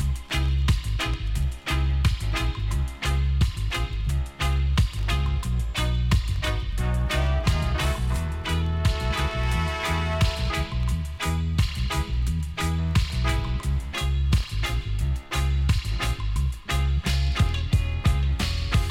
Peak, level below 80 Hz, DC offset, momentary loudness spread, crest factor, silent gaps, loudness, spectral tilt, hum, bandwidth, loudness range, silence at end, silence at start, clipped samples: -8 dBFS; -26 dBFS; under 0.1%; 4 LU; 16 dB; none; -26 LUFS; -5 dB/octave; none; 16 kHz; 1 LU; 0 s; 0 s; under 0.1%